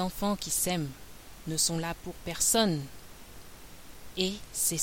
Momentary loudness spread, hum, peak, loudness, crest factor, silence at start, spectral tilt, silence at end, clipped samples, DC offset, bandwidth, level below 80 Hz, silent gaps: 24 LU; none; -10 dBFS; -29 LUFS; 22 dB; 0 s; -3 dB/octave; 0 s; under 0.1%; under 0.1%; 17 kHz; -50 dBFS; none